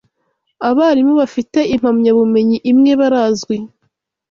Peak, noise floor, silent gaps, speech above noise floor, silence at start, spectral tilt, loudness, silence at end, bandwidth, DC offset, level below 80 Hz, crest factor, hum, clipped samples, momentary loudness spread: -2 dBFS; -67 dBFS; none; 55 dB; 0.6 s; -6 dB/octave; -13 LUFS; 0.65 s; 7.4 kHz; under 0.1%; -52 dBFS; 12 dB; none; under 0.1%; 9 LU